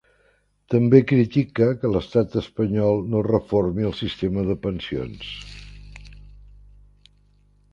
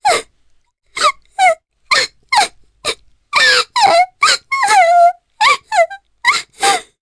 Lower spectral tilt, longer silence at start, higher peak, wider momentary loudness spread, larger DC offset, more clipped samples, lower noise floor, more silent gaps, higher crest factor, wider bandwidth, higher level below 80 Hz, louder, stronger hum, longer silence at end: first, -8.5 dB/octave vs 0.5 dB/octave; first, 0.7 s vs 0.05 s; about the same, 0 dBFS vs 0 dBFS; first, 18 LU vs 11 LU; neither; neither; first, -63 dBFS vs -54 dBFS; neither; first, 22 dB vs 14 dB; second, 7.4 kHz vs 11 kHz; first, -44 dBFS vs -56 dBFS; second, -22 LUFS vs -13 LUFS; first, 50 Hz at -45 dBFS vs none; first, 1.55 s vs 0.2 s